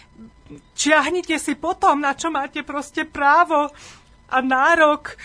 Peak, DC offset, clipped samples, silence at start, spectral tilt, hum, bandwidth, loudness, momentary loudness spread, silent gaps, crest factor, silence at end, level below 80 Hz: 0 dBFS; under 0.1%; under 0.1%; 0.2 s; -2 dB/octave; none; 11 kHz; -19 LUFS; 12 LU; none; 20 dB; 0 s; -52 dBFS